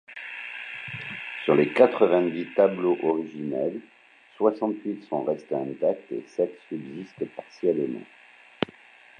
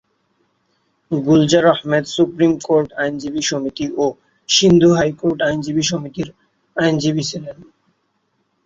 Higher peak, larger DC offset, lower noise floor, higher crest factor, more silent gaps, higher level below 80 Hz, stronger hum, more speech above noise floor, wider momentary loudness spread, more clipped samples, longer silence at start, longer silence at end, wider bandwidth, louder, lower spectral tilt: about the same, -4 dBFS vs -2 dBFS; neither; second, -52 dBFS vs -67 dBFS; first, 24 dB vs 16 dB; neither; second, -74 dBFS vs -52 dBFS; neither; second, 27 dB vs 51 dB; about the same, 14 LU vs 14 LU; neither; second, 0.1 s vs 1.1 s; second, 0.55 s vs 1 s; first, 9.4 kHz vs 7.8 kHz; second, -26 LUFS vs -17 LUFS; first, -7.5 dB/octave vs -4.5 dB/octave